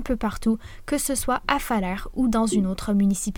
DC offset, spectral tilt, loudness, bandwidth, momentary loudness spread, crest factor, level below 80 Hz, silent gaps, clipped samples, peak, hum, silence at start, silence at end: under 0.1%; -5 dB/octave; -24 LUFS; 18.5 kHz; 6 LU; 20 dB; -38 dBFS; none; under 0.1%; -4 dBFS; none; 0 s; 0 s